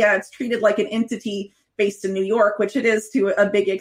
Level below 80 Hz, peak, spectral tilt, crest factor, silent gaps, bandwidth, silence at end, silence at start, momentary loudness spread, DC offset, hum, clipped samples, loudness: -68 dBFS; -4 dBFS; -5 dB/octave; 16 dB; none; 16 kHz; 0 s; 0 s; 8 LU; under 0.1%; none; under 0.1%; -21 LUFS